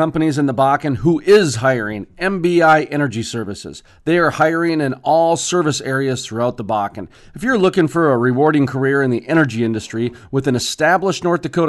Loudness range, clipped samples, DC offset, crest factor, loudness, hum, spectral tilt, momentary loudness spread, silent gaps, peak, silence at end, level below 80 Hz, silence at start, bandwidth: 2 LU; under 0.1%; under 0.1%; 14 dB; -16 LUFS; none; -5.5 dB/octave; 11 LU; none; -2 dBFS; 0 s; -48 dBFS; 0 s; 12 kHz